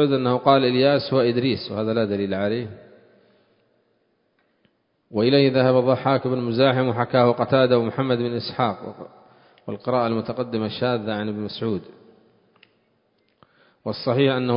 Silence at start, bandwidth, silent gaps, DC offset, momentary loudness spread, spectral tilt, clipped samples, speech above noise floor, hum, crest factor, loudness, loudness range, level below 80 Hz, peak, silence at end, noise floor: 0 s; 5.4 kHz; none; under 0.1%; 13 LU; -11 dB/octave; under 0.1%; 47 dB; none; 20 dB; -21 LUFS; 10 LU; -58 dBFS; -2 dBFS; 0 s; -67 dBFS